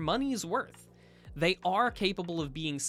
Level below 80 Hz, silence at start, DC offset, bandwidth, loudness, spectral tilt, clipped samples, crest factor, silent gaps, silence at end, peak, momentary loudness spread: -54 dBFS; 0 s; under 0.1%; 15 kHz; -31 LUFS; -4 dB/octave; under 0.1%; 18 dB; none; 0 s; -14 dBFS; 8 LU